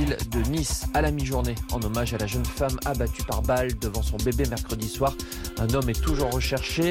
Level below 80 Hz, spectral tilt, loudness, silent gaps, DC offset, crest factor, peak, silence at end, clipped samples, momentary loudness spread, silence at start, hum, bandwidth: -30 dBFS; -5 dB/octave; -27 LUFS; none; under 0.1%; 14 dB; -12 dBFS; 0 s; under 0.1%; 4 LU; 0 s; none; 17 kHz